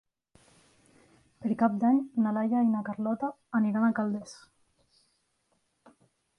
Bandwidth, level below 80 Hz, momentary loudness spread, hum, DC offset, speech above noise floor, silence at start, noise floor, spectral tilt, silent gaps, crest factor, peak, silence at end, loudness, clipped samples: 10.5 kHz; -74 dBFS; 8 LU; none; under 0.1%; 47 dB; 1.4 s; -75 dBFS; -8 dB/octave; none; 18 dB; -12 dBFS; 2 s; -28 LUFS; under 0.1%